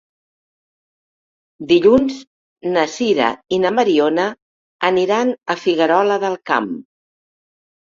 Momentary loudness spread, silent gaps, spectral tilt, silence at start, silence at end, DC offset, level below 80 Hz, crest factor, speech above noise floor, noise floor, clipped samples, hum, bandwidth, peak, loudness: 10 LU; 2.27-2.56 s, 4.42-4.79 s; -5 dB/octave; 1.6 s; 1.1 s; under 0.1%; -56 dBFS; 16 dB; over 74 dB; under -90 dBFS; under 0.1%; none; 7.6 kHz; -2 dBFS; -17 LUFS